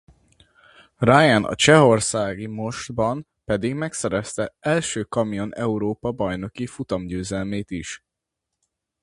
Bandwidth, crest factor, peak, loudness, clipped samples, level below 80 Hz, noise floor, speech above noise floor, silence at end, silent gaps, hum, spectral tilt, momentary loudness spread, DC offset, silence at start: 11.5 kHz; 22 dB; 0 dBFS; -22 LUFS; under 0.1%; -50 dBFS; -82 dBFS; 61 dB; 1.05 s; none; none; -4.5 dB/octave; 14 LU; under 0.1%; 1 s